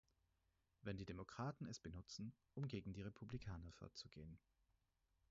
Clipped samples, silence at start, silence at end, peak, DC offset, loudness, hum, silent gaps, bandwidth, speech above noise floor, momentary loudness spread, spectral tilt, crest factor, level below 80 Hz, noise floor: under 0.1%; 0.85 s; 0.95 s; -36 dBFS; under 0.1%; -54 LUFS; none; none; 7.6 kHz; 33 dB; 8 LU; -6 dB/octave; 18 dB; -68 dBFS; -86 dBFS